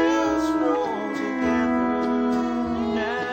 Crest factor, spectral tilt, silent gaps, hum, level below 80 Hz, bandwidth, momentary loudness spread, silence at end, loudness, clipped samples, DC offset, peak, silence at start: 12 dB; -5.5 dB/octave; none; none; -50 dBFS; 16.5 kHz; 4 LU; 0 s; -23 LUFS; under 0.1%; under 0.1%; -10 dBFS; 0 s